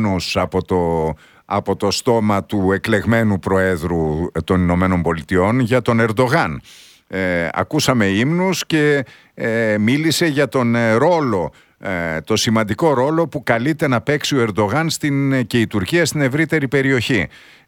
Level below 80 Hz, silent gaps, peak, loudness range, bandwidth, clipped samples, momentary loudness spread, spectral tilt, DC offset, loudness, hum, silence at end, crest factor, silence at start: -42 dBFS; none; -2 dBFS; 1 LU; 18.5 kHz; under 0.1%; 7 LU; -5.5 dB/octave; under 0.1%; -17 LUFS; none; 0.4 s; 16 dB; 0 s